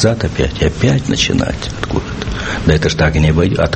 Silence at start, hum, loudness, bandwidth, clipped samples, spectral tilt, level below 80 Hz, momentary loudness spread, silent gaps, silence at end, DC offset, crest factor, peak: 0 s; none; -15 LUFS; 8.8 kHz; under 0.1%; -5.5 dB/octave; -24 dBFS; 8 LU; none; 0 s; under 0.1%; 14 dB; 0 dBFS